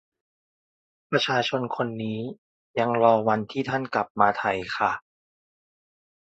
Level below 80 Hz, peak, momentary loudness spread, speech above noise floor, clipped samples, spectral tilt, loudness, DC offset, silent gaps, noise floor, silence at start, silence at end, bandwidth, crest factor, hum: -64 dBFS; -4 dBFS; 11 LU; over 66 dB; under 0.1%; -5.5 dB/octave; -25 LUFS; under 0.1%; 2.38-2.74 s, 4.10-4.15 s; under -90 dBFS; 1.1 s; 1.3 s; 8.2 kHz; 24 dB; none